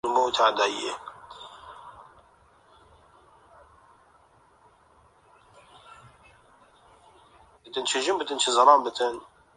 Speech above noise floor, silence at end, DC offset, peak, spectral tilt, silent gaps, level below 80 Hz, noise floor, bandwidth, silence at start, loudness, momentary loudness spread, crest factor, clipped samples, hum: 36 dB; 0.35 s; under 0.1%; -4 dBFS; -1 dB/octave; none; -68 dBFS; -60 dBFS; 11.5 kHz; 0.05 s; -23 LUFS; 26 LU; 24 dB; under 0.1%; none